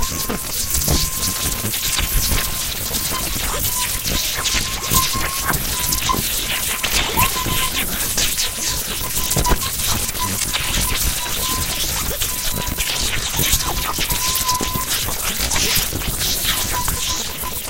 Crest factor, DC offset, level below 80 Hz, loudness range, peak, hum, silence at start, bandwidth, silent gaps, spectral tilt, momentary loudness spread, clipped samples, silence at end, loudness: 20 dB; under 0.1%; -28 dBFS; 1 LU; 0 dBFS; none; 0 s; 17 kHz; none; -1.5 dB/octave; 4 LU; under 0.1%; 0 s; -18 LUFS